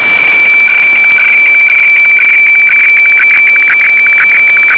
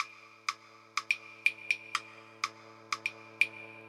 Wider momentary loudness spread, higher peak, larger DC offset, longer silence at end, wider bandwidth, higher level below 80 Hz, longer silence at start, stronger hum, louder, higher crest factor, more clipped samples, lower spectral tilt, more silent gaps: second, 1 LU vs 9 LU; first, 0 dBFS vs -10 dBFS; neither; about the same, 0 s vs 0 s; second, 5.4 kHz vs 16 kHz; first, -56 dBFS vs under -90 dBFS; about the same, 0 s vs 0 s; neither; first, -3 LUFS vs -34 LUFS; second, 4 dB vs 26 dB; neither; first, -3 dB/octave vs 0 dB/octave; neither